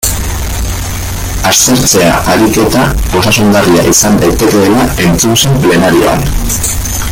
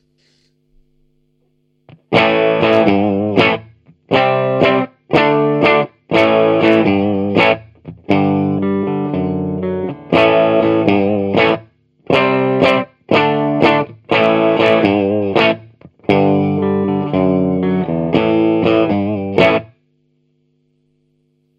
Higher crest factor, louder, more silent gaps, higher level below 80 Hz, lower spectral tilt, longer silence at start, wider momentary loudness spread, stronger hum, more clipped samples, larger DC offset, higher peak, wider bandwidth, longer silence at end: second, 8 dB vs 14 dB; first, -8 LUFS vs -14 LUFS; neither; first, -20 dBFS vs -52 dBFS; second, -4 dB/octave vs -7.5 dB/octave; second, 0 s vs 2.1 s; first, 10 LU vs 7 LU; second, none vs 50 Hz at -40 dBFS; first, 0.2% vs under 0.1%; neither; about the same, 0 dBFS vs 0 dBFS; first, over 20 kHz vs 8 kHz; second, 0 s vs 1.95 s